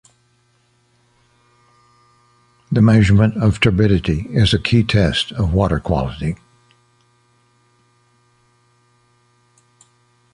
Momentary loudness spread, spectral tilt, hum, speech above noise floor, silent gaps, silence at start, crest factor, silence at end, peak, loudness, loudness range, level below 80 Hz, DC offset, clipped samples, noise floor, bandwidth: 10 LU; -7 dB/octave; none; 45 dB; none; 2.7 s; 18 dB; 4 s; -2 dBFS; -16 LUFS; 10 LU; -34 dBFS; under 0.1%; under 0.1%; -60 dBFS; 10.5 kHz